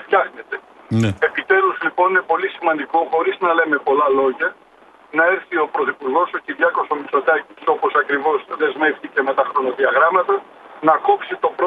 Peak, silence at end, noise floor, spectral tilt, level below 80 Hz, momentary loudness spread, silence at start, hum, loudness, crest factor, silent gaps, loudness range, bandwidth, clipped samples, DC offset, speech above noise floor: 0 dBFS; 0 s; -48 dBFS; -6.5 dB/octave; -64 dBFS; 7 LU; 0 s; none; -18 LUFS; 18 dB; none; 2 LU; 8.4 kHz; under 0.1%; under 0.1%; 30 dB